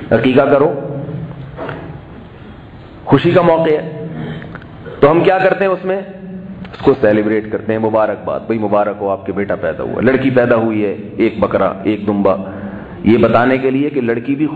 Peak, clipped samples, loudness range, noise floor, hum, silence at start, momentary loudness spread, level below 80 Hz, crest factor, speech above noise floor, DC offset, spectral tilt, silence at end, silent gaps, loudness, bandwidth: 0 dBFS; under 0.1%; 3 LU; -34 dBFS; none; 0 s; 18 LU; -44 dBFS; 14 dB; 21 dB; under 0.1%; -9.5 dB/octave; 0 s; none; -14 LUFS; 5 kHz